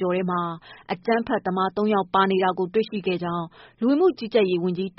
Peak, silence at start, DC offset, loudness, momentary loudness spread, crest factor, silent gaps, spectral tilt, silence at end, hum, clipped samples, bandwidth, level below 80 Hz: -8 dBFS; 0 s; under 0.1%; -23 LUFS; 10 LU; 16 dB; none; -5 dB/octave; 0.1 s; none; under 0.1%; 5.8 kHz; -62 dBFS